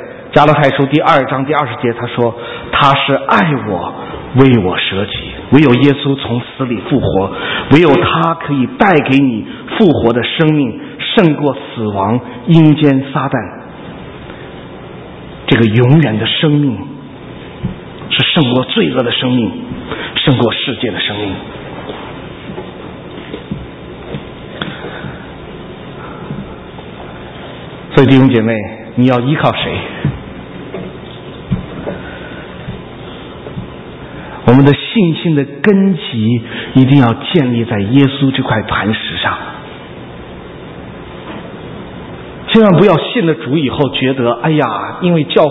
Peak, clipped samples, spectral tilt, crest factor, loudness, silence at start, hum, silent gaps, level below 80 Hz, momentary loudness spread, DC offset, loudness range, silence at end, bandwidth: 0 dBFS; 0.3%; -8.5 dB/octave; 14 dB; -12 LUFS; 0 s; none; none; -38 dBFS; 21 LU; under 0.1%; 14 LU; 0 s; 8 kHz